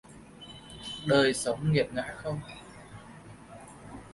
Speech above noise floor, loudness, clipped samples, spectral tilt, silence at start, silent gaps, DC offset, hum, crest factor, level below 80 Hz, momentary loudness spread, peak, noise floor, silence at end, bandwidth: 21 dB; -29 LUFS; under 0.1%; -5 dB/octave; 0.1 s; none; under 0.1%; none; 20 dB; -58 dBFS; 24 LU; -12 dBFS; -49 dBFS; 0 s; 11.5 kHz